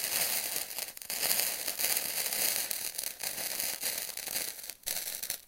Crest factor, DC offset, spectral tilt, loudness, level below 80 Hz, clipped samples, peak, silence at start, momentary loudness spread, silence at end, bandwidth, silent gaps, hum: 30 dB; under 0.1%; 1.5 dB/octave; -31 LUFS; -68 dBFS; under 0.1%; -4 dBFS; 0 s; 7 LU; 0 s; 17 kHz; none; none